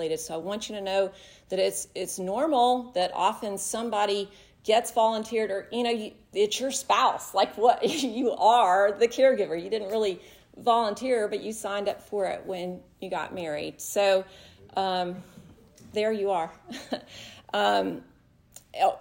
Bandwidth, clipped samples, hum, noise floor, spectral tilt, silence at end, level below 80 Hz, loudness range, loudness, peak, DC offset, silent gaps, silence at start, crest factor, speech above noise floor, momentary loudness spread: 16.5 kHz; under 0.1%; none; -54 dBFS; -3 dB/octave; 0 s; -66 dBFS; 6 LU; -27 LUFS; -8 dBFS; under 0.1%; none; 0 s; 20 dB; 28 dB; 12 LU